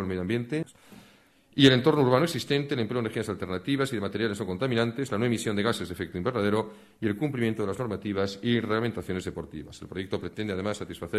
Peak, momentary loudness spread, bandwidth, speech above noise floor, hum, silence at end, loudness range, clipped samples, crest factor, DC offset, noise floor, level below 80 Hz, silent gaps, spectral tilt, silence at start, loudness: -6 dBFS; 12 LU; 14.5 kHz; 31 dB; none; 0 s; 5 LU; under 0.1%; 22 dB; under 0.1%; -59 dBFS; -58 dBFS; none; -6 dB/octave; 0 s; -28 LUFS